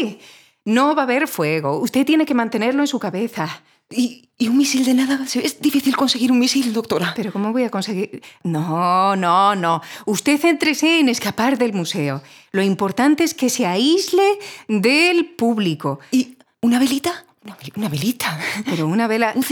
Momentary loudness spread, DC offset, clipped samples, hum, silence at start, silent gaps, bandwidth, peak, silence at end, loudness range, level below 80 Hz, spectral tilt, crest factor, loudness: 10 LU; under 0.1%; under 0.1%; none; 0 s; none; 20 kHz; -2 dBFS; 0 s; 3 LU; -68 dBFS; -4.5 dB/octave; 16 dB; -18 LUFS